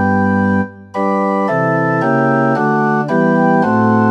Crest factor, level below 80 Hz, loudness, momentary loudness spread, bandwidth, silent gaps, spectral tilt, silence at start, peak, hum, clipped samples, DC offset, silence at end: 12 dB; -58 dBFS; -14 LUFS; 4 LU; 8.2 kHz; none; -9 dB/octave; 0 s; 0 dBFS; none; under 0.1%; under 0.1%; 0 s